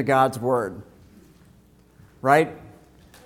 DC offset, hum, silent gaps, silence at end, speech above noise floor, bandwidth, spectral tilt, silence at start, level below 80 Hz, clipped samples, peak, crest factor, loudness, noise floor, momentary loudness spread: under 0.1%; none; none; 0.6 s; 33 dB; 17.5 kHz; -6 dB/octave; 0 s; -58 dBFS; under 0.1%; -2 dBFS; 22 dB; -22 LUFS; -54 dBFS; 20 LU